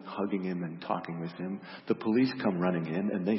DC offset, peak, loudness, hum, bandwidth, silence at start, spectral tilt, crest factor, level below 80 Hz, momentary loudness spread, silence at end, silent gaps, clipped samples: under 0.1%; -14 dBFS; -32 LUFS; none; 5.8 kHz; 0 s; -11 dB/octave; 18 dB; -76 dBFS; 11 LU; 0 s; none; under 0.1%